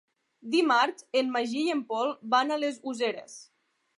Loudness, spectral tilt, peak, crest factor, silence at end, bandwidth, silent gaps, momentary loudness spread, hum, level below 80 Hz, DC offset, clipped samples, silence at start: -28 LUFS; -3 dB/octave; -12 dBFS; 18 dB; 0.55 s; 11.5 kHz; none; 15 LU; none; -86 dBFS; under 0.1%; under 0.1%; 0.45 s